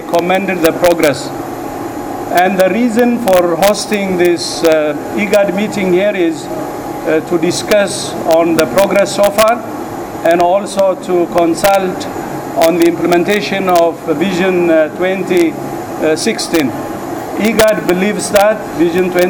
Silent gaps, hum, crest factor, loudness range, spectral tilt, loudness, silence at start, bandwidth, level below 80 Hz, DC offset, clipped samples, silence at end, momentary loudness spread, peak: none; none; 12 dB; 2 LU; -4.5 dB/octave; -13 LUFS; 0 s; over 20 kHz; -44 dBFS; under 0.1%; under 0.1%; 0 s; 11 LU; 0 dBFS